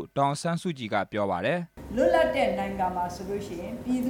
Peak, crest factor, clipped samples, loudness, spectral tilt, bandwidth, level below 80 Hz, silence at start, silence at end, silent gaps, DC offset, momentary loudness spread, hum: -10 dBFS; 16 dB; under 0.1%; -28 LUFS; -6 dB/octave; 18 kHz; -50 dBFS; 0 s; 0 s; none; under 0.1%; 11 LU; none